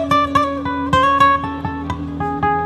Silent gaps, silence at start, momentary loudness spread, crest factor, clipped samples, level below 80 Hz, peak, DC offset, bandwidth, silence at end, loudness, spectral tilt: none; 0 s; 12 LU; 16 dB; under 0.1%; -40 dBFS; -2 dBFS; under 0.1%; 12.5 kHz; 0 s; -17 LUFS; -6 dB/octave